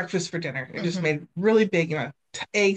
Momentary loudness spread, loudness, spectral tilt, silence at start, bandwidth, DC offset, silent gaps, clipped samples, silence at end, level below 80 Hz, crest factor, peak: 10 LU; -25 LUFS; -5 dB/octave; 0 s; 9 kHz; under 0.1%; none; under 0.1%; 0 s; -70 dBFS; 16 dB; -8 dBFS